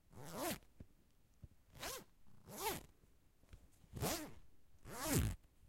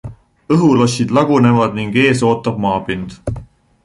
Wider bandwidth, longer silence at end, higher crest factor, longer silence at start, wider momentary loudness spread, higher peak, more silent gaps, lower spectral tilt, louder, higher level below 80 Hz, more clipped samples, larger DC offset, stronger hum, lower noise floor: first, 16.5 kHz vs 11.5 kHz; second, 0 s vs 0.4 s; first, 26 dB vs 14 dB; about the same, 0.1 s vs 0.05 s; first, 26 LU vs 15 LU; second, -22 dBFS vs -2 dBFS; neither; second, -4 dB/octave vs -6.5 dB/octave; second, -45 LUFS vs -14 LUFS; second, -58 dBFS vs -40 dBFS; neither; neither; neither; first, -71 dBFS vs -35 dBFS